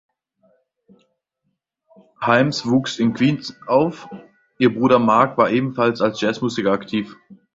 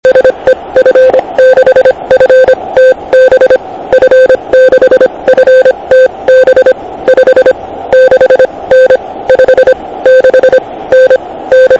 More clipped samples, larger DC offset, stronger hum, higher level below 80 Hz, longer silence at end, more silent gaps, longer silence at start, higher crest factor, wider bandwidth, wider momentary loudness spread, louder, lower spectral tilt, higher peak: second, under 0.1% vs 10%; second, under 0.1% vs 0.3%; neither; second, -58 dBFS vs -40 dBFS; first, 0.2 s vs 0 s; neither; first, 2.2 s vs 0.05 s; first, 18 dB vs 4 dB; about the same, 7.8 kHz vs 7.2 kHz; first, 11 LU vs 5 LU; second, -19 LUFS vs -6 LUFS; first, -6 dB/octave vs -4.5 dB/octave; about the same, -2 dBFS vs 0 dBFS